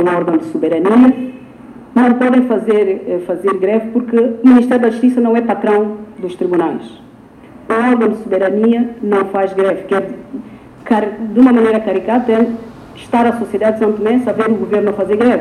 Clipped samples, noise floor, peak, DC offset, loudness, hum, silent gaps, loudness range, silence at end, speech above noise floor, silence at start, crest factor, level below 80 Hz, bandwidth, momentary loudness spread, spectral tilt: under 0.1%; -39 dBFS; 0 dBFS; under 0.1%; -13 LUFS; none; none; 3 LU; 0 s; 26 dB; 0 s; 14 dB; -52 dBFS; 10 kHz; 11 LU; -7.5 dB/octave